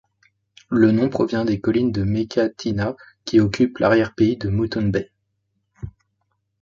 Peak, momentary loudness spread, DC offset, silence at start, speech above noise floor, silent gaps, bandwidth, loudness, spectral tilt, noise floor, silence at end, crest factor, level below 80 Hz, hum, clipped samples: -2 dBFS; 17 LU; under 0.1%; 0.7 s; 53 dB; none; 7.4 kHz; -20 LUFS; -7.5 dB/octave; -72 dBFS; 0.7 s; 18 dB; -46 dBFS; none; under 0.1%